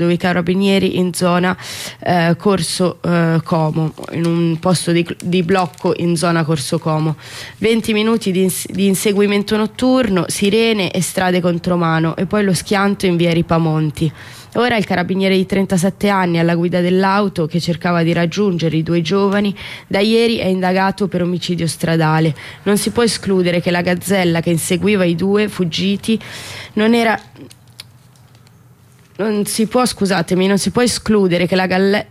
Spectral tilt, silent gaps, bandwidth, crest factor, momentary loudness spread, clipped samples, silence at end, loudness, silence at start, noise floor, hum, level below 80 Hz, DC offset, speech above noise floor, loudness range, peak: -5.5 dB/octave; none; 15.5 kHz; 12 dB; 5 LU; under 0.1%; 0.05 s; -16 LUFS; 0 s; -46 dBFS; none; -48 dBFS; under 0.1%; 31 dB; 2 LU; -4 dBFS